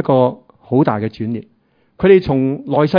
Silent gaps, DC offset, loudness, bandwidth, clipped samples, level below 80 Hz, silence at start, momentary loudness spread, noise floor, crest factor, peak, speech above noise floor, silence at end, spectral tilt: none; under 0.1%; -16 LUFS; 5.2 kHz; under 0.1%; -46 dBFS; 0 s; 12 LU; -46 dBFS; 14 dB; 0 dBFS; 32 dB; 0 s; -10 dB/octave